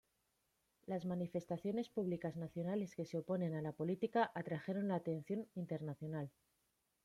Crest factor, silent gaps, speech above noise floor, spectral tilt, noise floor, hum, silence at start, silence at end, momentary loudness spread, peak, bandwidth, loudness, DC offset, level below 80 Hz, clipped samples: 20 dB; none; 42 dB; -8 dB/octave; -83 dBFS; none; 0.9 s; 0.75 s; 7 LU; -24 dBFS; 13 kHz; -42 LUFS; under 0.1%; -80 dBFS; under 0.1%